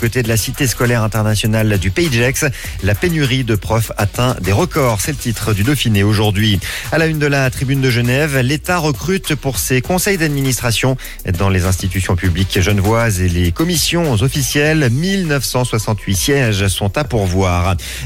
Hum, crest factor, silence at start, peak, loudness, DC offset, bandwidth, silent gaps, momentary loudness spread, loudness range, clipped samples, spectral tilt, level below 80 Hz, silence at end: none; 12 dB; 0 s; -2 dBFS; -15 LUFS; under 0.1%; 17 kHz; none; 4 LU; 1 LU; under 0.1%; -5 dB/octave; -30 dBFS; 0 s